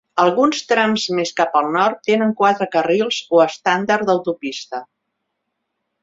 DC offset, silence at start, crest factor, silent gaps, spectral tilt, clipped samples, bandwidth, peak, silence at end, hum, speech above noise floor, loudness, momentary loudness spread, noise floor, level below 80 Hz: under 0.1%; 0.15 s; 18 dB; none; -4 dB/octave; under 0.1%; 7.8 kHz; 0 dBFS; 1.2 s; none; 58 dB; -17 LUFS; 9 LU; -75 dBFS; -64 dBFS